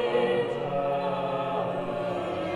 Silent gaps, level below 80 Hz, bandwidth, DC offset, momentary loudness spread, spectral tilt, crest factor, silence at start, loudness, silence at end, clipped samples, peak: none; -60 dBFS; 11 kHz; under 0.1%; 5 LU; -7 dB/octave; 14 dB; 0 s; -28 LUFS; 0 s; under 0.1%; -14 dBFS